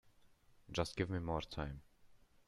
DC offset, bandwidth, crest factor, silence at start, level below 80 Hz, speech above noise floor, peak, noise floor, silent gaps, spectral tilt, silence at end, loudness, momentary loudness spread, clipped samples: under 0.1%; 12.5 kHz; 24 dB; 0.05 s; -58 dBFS; 26 dB; -20 dBFS; -67 dBFS; none; -5.5 dB/octave; 0.3 s; -42 LUFS; 8 LU; under 0.1%